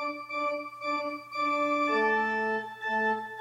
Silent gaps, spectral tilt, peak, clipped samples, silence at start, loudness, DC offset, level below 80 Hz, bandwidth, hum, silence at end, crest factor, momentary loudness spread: none; -4.5 dB/octave; -16 dBFS; under 0.1%; 0 s; -29 LUFS; under 0.1%; -88 dBFS; 16 kHz; none; 0 s; 14 dB; 7 LU